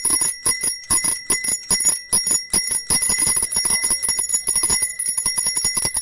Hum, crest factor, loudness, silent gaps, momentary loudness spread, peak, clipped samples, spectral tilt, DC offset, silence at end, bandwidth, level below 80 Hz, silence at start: none; 16 dB; -16 LUFS; none; 3 LU; -4 dBFS; under 0.1%; 0.5 dB/octave; under 0.1%; 0 s; 11.5 kHz; -44 dBFS; 0 s